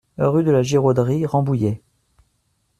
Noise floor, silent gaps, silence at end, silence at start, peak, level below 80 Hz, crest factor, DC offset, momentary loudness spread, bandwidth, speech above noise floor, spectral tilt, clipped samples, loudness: -67 dBFS; none; 1.05 s; 0.2 s; -4 dBFS; -54 dBFS; 14 dB; under 0.1%; 6 LU; 12.5 kHz; 50 dB; -7.5 dB/octave; under 0.1%; -19 LUFS